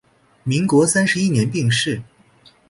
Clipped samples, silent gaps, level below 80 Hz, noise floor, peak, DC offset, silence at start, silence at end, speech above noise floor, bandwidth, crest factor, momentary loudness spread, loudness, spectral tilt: under 0.1%; none; -54 dBFS; -52 dBFS; -4 dBFS; under 0.1%; 0.45 s; 0.65 s; 35 dB; 11.5 kHz; 16 dB; 10 LU; -18 LUFS; -4.5 dB/octave